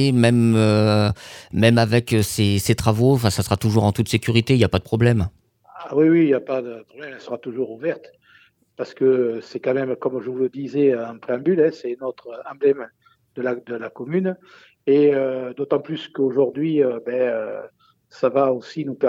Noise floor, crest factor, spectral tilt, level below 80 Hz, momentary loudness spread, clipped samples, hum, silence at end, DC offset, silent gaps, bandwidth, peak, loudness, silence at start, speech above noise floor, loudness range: -55 dBFS; 18 dB; -6.5 dB/octave; -48 dBFS; 15 LU; under 0.1%; none; 0 s; under 0.1%; none; 17.5 kHz; -2 dBFS; -20 LUFS; 0 s; 36 dB; 6 LU